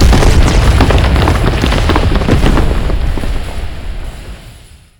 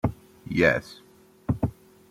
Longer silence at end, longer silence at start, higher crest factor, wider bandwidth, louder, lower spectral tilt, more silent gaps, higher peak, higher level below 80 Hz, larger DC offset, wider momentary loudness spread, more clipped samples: about the same, 0.45 s vs 0.4 s; about the same, 0 s vs 0.05 s; second, 10 dB vs 22 dB; about the same, 17 kHz vs 16 kHz; first, -12 LUFS vs -26 LUFS; about the same, -6 dB/octave vs -7 dB/octave; neither; first, 0 dBFS vs -6 dBFS; first, -12 dBFS vs -48 dBFS; neither; second, 17 LU vs 21 LU; first, 0.6% vs under 0.1%